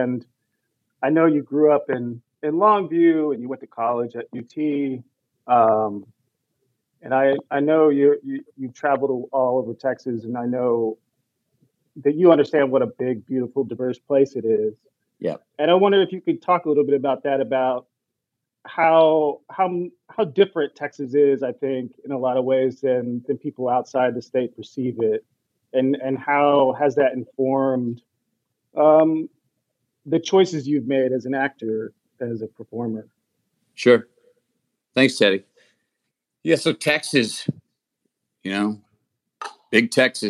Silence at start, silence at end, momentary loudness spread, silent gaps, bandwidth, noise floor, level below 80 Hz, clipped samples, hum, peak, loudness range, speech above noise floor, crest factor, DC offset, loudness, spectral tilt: 0 s; 0 s; 13 LU; none; 12.5 kHz; -82 dBFS; -80 dBFS; under 0.1%; none; -2 dBFS; 4 LU; 61 dB; 20 dB; under 0.1%; -21 LUFS; -5.5 dB/octave